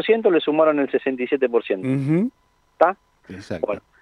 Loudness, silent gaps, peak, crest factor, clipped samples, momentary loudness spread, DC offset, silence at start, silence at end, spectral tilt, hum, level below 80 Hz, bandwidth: -21 LUFS; none; -2 dBFS; 18 dB; under 0.1%; 13 LU; under 0.1%; 0 s; 0.2 s; -8 dB/octave; none; -64 dBFS; 10 kHz